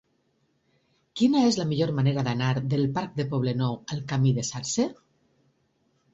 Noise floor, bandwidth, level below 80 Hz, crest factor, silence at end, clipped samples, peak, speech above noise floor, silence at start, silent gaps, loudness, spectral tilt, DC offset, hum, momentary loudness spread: -70 dBFS; 8 kHz; -60 dBFS; 18 dB; 1.2 s; under 0.1%; -10 dBFS; 45 dB; 1.15 s; none; -26 LUFS; -6 dB/octave; under 0.1%; none; 7 LU